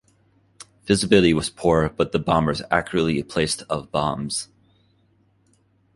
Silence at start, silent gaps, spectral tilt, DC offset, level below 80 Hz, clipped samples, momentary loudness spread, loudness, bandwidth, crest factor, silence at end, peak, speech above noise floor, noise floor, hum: 0.85 s; none; -5 dB/octave; under 0.1%; -44 dBFS; under 0.1%; 10 LU; -21 LUFS; 11.5 kHz; 20 dB; 1.5 s; -2 dBFS; 41 dB; -62 dBFS; none